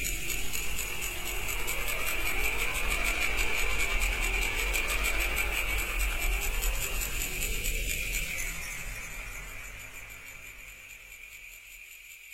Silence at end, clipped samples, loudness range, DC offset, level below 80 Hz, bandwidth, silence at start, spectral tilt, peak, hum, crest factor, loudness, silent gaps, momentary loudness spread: 0 s; under 0.1%; 11 LU; under 0.1%; -36 dBFS; 16 kHz; 0 s; -1.5 dB/octave; -14 dBFS; none; 16 dB; -31 LUFS; none; 16 LU